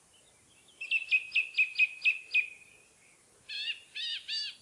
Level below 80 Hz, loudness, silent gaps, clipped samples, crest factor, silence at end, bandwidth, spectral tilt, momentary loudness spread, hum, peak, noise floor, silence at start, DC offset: -84 dBFS; -29 LUFS; none; under 0.1%; 18 dB; 0.05 s; 11.5 kHz; 2.5 dB/octave; 11 LU; none; -16 dBFS; -63 dBFS; 0.8 s; under 0.1%